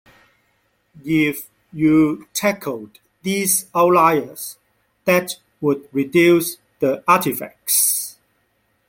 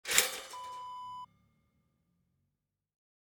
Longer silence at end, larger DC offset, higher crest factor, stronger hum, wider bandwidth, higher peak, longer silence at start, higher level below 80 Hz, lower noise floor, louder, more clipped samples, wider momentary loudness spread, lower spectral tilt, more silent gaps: second, 0.8 s vs 2 s; neither; second, 18 dB vs 36 dB; neither; second, 17 kHz vs over 20 kHz; about the same, -2 dBFS vs -4 dBFS; first, 0.95 s vs 0.05 s; first, -58 dBFS vs -74 dBFS; second, -65 dBFS vs -85 dBFS; first, -18 LUFS vs -34 LUFS; neither; second, 16 LU vs 20 LU; first, -4 dB/octave vs 1.5 dB/octave; neither